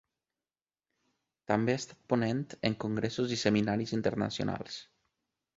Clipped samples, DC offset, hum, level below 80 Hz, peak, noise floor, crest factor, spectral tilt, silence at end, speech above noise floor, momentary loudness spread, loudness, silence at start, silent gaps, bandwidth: under 0.1%; under 0.1%; none; -64 dBFS; -10 dBFS; under -90 dBFS; 22 dB; -5.5 dB/octave; 0.75 s; over 59 dB; 9 LU; -32 LUFS; 1.5 s; none; 8 kHz